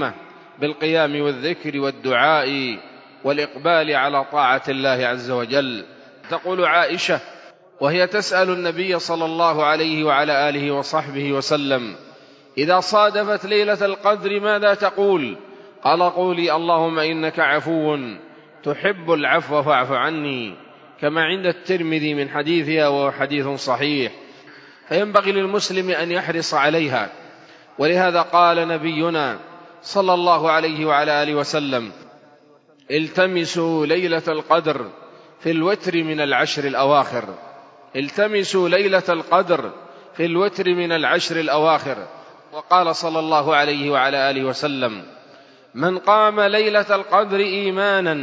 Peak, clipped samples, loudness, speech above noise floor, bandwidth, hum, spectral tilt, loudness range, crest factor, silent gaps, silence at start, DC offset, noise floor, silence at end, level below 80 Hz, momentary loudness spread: 0 dBFS; under 0.1%; -19 LUFS; 33 dB; 7.8 kHz; none; -4.5 dB/octave; 2 LU; 20 dB; none; 0 s; under 0.1%; -52 dBFS; 0 s; -74 dBFS; 9 LU